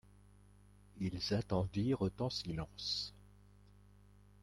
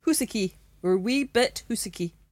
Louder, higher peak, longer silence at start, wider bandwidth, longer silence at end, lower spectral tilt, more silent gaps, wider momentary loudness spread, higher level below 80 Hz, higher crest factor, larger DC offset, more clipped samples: second, -39 LUFS vs -27 LUFS; second, -22 dBFS vs -10 dBFS; first, 0.95 s vs 0.05 s; second, 13 kHz vs 16.5 kHz; first, 1.15 s vs 0.2 s; first, -6 dB/octave vs -4 dB/octave; neither; about the same, 7 LU vs 8 LU; about the same, -60 dBFS vs -56 dBFS; about the same, 18 dB vs 16 dB; neither; neither